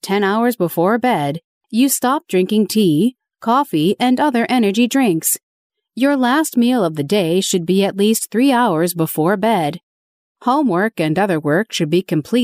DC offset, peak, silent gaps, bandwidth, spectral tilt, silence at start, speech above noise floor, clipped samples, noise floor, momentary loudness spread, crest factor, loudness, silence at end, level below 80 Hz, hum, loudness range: under 0.1%; -4 dBFS; 1.44-1.61 s, 5.43-5.70 s, 9.83-10.35 s; 16 kHz; -4.5 dB/octave; 0.05 s; over 74 dB; under 0.1%; under -90 dBFS; 4 LU; 12 dB; -16 LUFS; 0 s; -64 dBFS; none; 2 LU